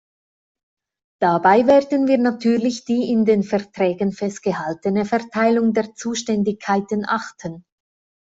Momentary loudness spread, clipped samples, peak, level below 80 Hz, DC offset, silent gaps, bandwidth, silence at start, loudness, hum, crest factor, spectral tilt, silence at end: 9 LU; under 0.1%; -2 dBFS; -60 dBFS; under 0.1%; none; 8 kHz; 1.2 s; -19 LUFS; none; 18 dB; -6 dB/octave; 0.7 s